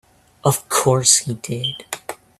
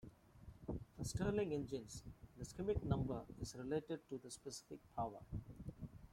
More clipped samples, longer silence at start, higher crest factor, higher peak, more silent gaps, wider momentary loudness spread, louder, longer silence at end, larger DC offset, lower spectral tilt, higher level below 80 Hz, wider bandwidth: neither; first, 0.45 s vs 0.05 s; about the same, 20 dB vs 22 dB; first, 0 dBFS vs -24 dBFS; neither; about the same, 16 LU vs 15 LU; first, -17 LUFS vs -46 LUFS; first, 0.25 s vs 0 s; neither; second, -3 dB/octave vs -6 dB/octave; about the same, -56 dBFS vs -58 dBFS; about the same, 15.5 kHz vs 16.5 kHz